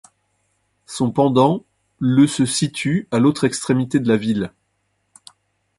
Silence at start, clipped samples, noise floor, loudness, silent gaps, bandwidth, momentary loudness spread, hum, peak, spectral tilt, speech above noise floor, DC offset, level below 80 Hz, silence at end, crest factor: 0.9 s; under 0.1%; -69 dBFS; -18 LUFS; none; 11.5 kHz; 9 LU; none; -2 dBFS; -5.5 dB/octave; 52 dB; under 0.1%; -56 dBFS; 1.3 s; 18 dB